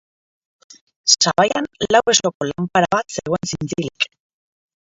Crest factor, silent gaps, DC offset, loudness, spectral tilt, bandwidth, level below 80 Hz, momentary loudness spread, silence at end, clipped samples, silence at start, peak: 20 dB; 2.35-2.40 s; under 0.1%; -18 LUFS; -2.5 dB/octave; 8 kHz; -54 dBFS; 10 LU; 0.9 s; under 0.1%; 1.05 s; 0 dBFS